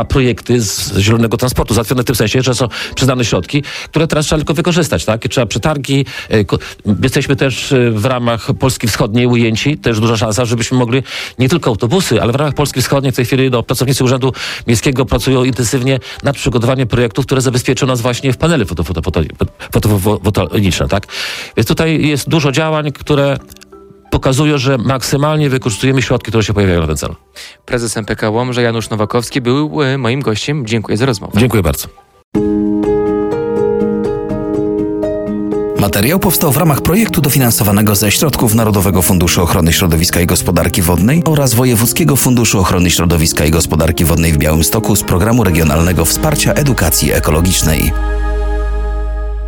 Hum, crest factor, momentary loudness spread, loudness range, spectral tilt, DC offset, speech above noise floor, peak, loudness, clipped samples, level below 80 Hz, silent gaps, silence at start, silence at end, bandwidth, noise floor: none; 12 dB; 7 LU; 4 LU; -5 dB/octave; under 0.1%; 26 dB; 0 dBFS; -13 LUFS; under 0.1%; -26 dBFS; 32.24-32.32 s; 0 s; 0 s; 17.5 kHz; -38 dBFS